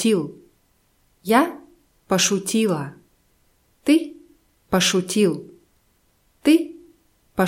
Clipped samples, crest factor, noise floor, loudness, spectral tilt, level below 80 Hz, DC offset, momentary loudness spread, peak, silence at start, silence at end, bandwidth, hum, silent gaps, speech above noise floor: under 0.1%; 20 dB; -63 dBFS; -21 LUFS; -4 dB/octave; -58 dBFS; under 0.1%; 16 LU; -4 dBFS; 0 s; 0 s; 16.5 kHz; none; none; 44 dB